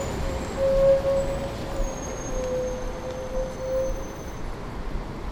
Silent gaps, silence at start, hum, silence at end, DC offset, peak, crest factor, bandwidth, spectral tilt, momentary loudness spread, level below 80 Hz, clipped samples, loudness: none; 0 s; none; 0 s; under 0.1%; -10 dBFS; 16 dB; 18.5 kHz; -5.5 dB/octave; 15 LU; -34 dBFS; under 0.1%; -28 LUFS